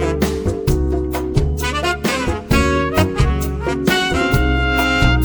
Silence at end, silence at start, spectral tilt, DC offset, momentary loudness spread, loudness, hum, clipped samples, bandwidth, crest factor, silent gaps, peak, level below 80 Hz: 0 s; 0 s; -5.5 dB/octave; under 0.1%; 5 LU; -17 LUFS; none; under 0.1%; over 20 kHz; 14 dB; none; -2 dBFS; -22 dBFS